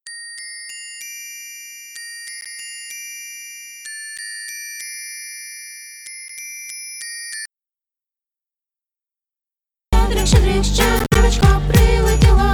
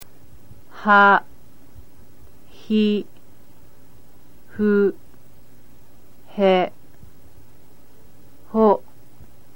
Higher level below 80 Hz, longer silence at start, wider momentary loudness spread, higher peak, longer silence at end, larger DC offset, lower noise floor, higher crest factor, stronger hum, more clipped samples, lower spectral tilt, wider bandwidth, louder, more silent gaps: first, -22 dBFS vs -56 dBFS; about the same, 0.05 s vs 0 s; first, 18 LU vs 14 LU; about the same, 0 dBFS vs -2 dBFS; second, 0 s vs 0.8 s; second, under 0.1% vs 2%; first, -90 dBFS vs -52 dBFS; about the same, 20 dB vs 20 dB; neither; neither; second, -4.5 dB/octave vs -7 dB/octave; first, 19 kHz vs 17 kHz; about the same, -20 LUFS vs -19 LUFS; neither